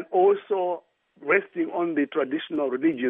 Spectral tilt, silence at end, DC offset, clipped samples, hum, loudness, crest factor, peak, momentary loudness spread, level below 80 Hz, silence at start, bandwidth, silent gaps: -3.5 dB/octave; 0 s; under 0.1%; under 0.1%; none; -25 LUFS; 18 dB; -6 dBFS; 8 LU; -78 dBFS; 0 s; 3.8 kHz; none